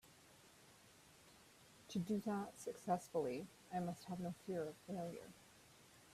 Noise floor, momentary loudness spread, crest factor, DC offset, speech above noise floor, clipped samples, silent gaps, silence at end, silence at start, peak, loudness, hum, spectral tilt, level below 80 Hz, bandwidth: -67 dBFS; 22 LU; 22 dB; under 0.1%; 22 dB; under 0.1%; none; 0 s; 0.05 s; -26 dBFS; -46 LUFS; none; -6 dB/octave; -80 dBFS; 15 kHz